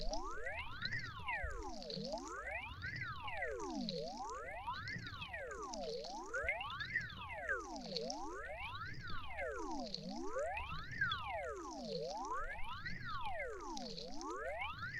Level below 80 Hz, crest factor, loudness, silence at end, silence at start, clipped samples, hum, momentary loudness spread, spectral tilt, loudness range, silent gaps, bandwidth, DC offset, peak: -56 dBFS; 20 dB; -44 LUFS; 0 s; 0 s; under 0.1%; none; 6 LU; -4 dB/octave; 2 LU; none; 12.5 kHz; under 0.1%; -24 dBFS